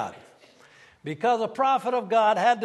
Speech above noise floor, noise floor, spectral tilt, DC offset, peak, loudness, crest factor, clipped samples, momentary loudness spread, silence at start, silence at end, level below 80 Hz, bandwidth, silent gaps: 32 dB; -54 dBFS; -4.5 dB/octave; under 0.1%; -8 dBFS; -23 LUFS; 18 dB; under 0.1%; 15 LU; 0 s; 0 s; -76 dBFS; 12 kHz; none